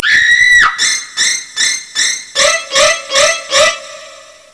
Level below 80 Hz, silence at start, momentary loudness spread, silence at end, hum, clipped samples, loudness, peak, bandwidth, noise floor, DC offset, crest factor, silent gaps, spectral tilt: -46 dBFS; 0 s; 7 LU; 0.3 s; none; under 0.1%; -10 LUFS; 0 dBFS; 11 kHz; -36 dBFS; under 0.1%; 12 dB; none; 2 dB/octave